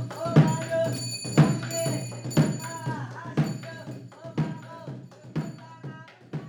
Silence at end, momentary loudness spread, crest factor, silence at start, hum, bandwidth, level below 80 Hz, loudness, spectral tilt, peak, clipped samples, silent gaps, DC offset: 0 s; 19 LU; 20 dB; 0 s; none; 18 kHz; -60 dBFS; -27 LUFS; -6 dB/octave; -8 dBFS; under 0.1%; none; under 0.1%